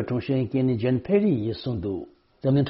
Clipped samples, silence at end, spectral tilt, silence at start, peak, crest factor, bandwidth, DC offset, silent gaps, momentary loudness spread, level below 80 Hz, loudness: under 0.1%; 0 s; -8 dB/octave; 0 s; -10 dBFS; 14 dB; 5.8 kHz; under 0.1%; none; 10 LU; -54 dBFS; -25 LUFS